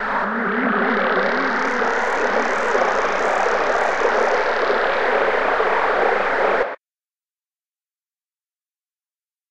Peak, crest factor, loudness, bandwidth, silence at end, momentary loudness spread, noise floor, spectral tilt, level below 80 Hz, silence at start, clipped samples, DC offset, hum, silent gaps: -4 dBFS; 16 dB; -19 LUFS; 10.5 kHz; 0 s; 2 LU; under -90 dBFS; -4 dB/octave; -48 dBFS; 0 s; under 0.1%; under 0.1%; none; none